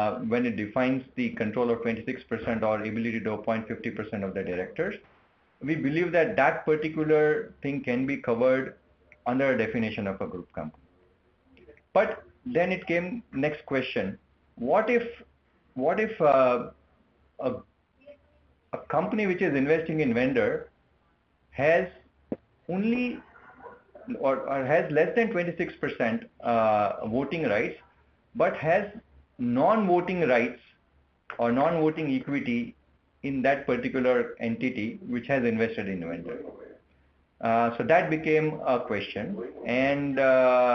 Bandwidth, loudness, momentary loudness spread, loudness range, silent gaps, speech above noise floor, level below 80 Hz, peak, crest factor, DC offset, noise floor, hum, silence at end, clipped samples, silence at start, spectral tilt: 6.6 kHz; -27 LUFS; 13 LU; 4 LU; none; 41 dB; -62 dBFS; -8 dBFS; 20 dB; under 0.1%; -67 dBFS; none; 0 s; under 0.1%; 0 s; -8 dB/octave